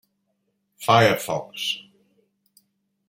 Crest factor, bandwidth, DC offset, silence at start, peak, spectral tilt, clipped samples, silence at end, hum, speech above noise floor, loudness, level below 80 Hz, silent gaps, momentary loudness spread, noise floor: 22 dB; 16.5 kHz; under 0.1%; 0.8 s; -2 dBFS; -4 dB/octave; under 0.1%; 1.3 s; none; 53 dB; -22 LUFS; -64 dBFS; none; 13 LU; -73 dBFS